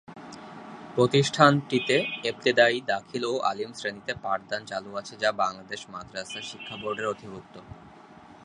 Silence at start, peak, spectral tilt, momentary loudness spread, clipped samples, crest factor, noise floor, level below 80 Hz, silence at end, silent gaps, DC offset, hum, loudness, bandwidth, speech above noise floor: 0.1 s; -2 dBFS; -4.5 dB/octave; 22 LU; under 0.1%; 24 dB; -50 dBFS; -64 dBFS; 0.1 s; none; under 0.1%; none; -26 LUFS; 11 kHz; 23 dB